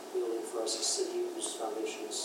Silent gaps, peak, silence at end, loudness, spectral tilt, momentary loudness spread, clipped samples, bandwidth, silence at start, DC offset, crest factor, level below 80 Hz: none; -20 dBFS; 0 s; -34 LUFS; -0.5 dB/octave; 6 LU; under 0.1%; 16 kHz; 0 s; under 0.1%; 16 dB; under -90 dBFS